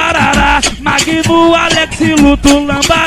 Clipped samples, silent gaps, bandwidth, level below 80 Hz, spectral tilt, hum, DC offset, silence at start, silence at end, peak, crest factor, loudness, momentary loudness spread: 0.7%; none; 16 kHz; -24 dBFS; -3.5 dB/octave; none; under 0.1%; 0 s; 0 s; 0 dBFS; 10 dB; -9 LUFS; 3 LU